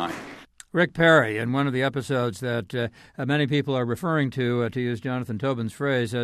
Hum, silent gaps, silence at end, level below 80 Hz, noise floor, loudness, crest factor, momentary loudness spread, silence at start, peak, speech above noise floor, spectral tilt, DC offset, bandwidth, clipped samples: none; none; 0 s; -60 dBFS; -44 dBFS; -24 LUFS; 18 dB; 11 LU; 0 s; -6 dBFS; 20 dB; -6.5 dB/octave; under 0.1%; 14.5 kHz; under 0.1%